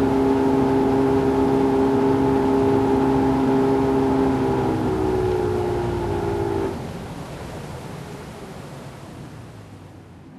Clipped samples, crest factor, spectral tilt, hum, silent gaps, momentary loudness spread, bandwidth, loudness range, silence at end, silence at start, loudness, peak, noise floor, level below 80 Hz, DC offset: under 0.1%; 14 dB; -8 dB/octave; none; none; 18 LU; 13 kHz; 14 LU; 0 s; 0 s; -20 LUFS; -8 dBFS; -42 dBFS; -38 dBFS; under 0.1%